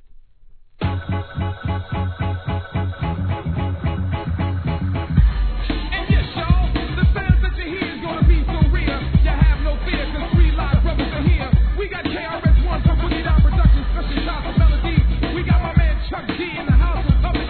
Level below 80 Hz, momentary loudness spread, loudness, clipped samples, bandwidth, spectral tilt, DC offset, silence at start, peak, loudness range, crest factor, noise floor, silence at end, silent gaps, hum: -20 dBFS; 8 LU; -20 LUFS; under 0.1%; 4.5 kHz; -10.5 dB/octave; 0.3%; 0.8 s; -2 dBFS; 5 LU; 16 dB; -44 dBFS; 0 s; none; none